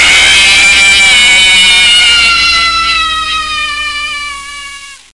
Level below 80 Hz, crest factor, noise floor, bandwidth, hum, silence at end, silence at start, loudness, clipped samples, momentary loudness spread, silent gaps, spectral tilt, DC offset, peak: -32 dBFS; 8 dB; -27 dBFS; 12 kHz; none; 0.2 s; 0 s; -4 LUFS; 0.1%; 16 LU; none; 1.5 dB/octave; under 0.1%; 0 dBFS